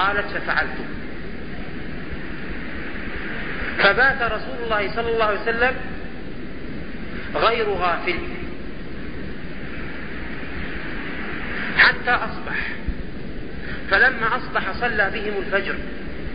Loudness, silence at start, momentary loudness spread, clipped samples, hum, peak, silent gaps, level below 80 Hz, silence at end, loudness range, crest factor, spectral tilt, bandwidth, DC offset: -23 LUFS; 0 s; 17 LU; under 0.1%; none; -2 dBFS; none; -38 dBFS; 0 s; 8 LU; 22 dB; -9.5 dB/octave; 5.2 kHz; 4%